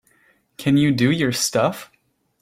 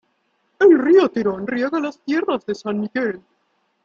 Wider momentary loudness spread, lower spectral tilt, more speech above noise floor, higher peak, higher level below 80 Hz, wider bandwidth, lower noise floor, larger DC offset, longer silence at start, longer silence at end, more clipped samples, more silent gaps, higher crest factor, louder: second, 8 LU vs 11 LU; second, -5 dB/octave vs -6.5 dB/octave; second, 41 dB vs 49 dB; about the same, -4 dBFS vs -4 dBFS; first, -56 dBFS vs -64 dBFS; first, 16.5 kHz vs 7.2 kHz; second, -60 dBFS vs -67 dBFS; neither; about the same, 0.6 s vs 0.6 s; about the same, 0.6 s vs 0.65 s; neither; neither; about the same, 16 dB vs 16 dB; about the same, -19 LUFS vs -19 LUFS